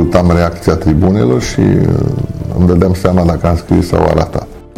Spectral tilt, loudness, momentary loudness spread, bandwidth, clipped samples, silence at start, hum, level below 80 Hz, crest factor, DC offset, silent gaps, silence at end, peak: -7.5 dB/octave; -12 LUFS; 6 LU; 14 kHz; 0.8%; 0 s; none; -24 dBFS; 10 dB; 0.2%; none; 0.15 s; 0 dBFS